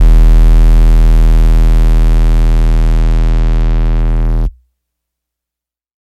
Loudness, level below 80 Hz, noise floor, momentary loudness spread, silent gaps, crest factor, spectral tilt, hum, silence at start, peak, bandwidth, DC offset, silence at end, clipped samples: -12 LUFS; -8 dBFS; -86 dBFS; 6 LU; none; 8 dB; -7.5 dB/octave; none; 0 s; 0 dBFS; 4.9 kHz; under 0.1%; 1.5 s; under 0.1%